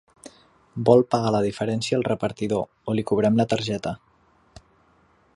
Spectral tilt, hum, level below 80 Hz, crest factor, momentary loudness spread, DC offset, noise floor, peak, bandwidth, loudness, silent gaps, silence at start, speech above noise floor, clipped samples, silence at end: -6.5 dB/octave; none; -56 dBFS; 22 dB; 11 LU; under 0.1%; -60 dBFS; -2 dBFS; 11.5 kHz; -23 LUFS; none; 0.75 s; 38 dB; under 0.1%; 1.4 s